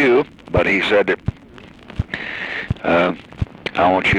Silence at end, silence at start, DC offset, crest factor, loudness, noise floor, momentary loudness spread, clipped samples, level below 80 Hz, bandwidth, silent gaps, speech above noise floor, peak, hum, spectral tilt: 0 s; 0 s; under 0.1%; 14 dB; -19 LUFS; -41 dBFS; 13 LU; under 0.1%; -36 dBFS; 11 kHz; none; 25 dB; -4 dBFS; none; -6.5 dB/octave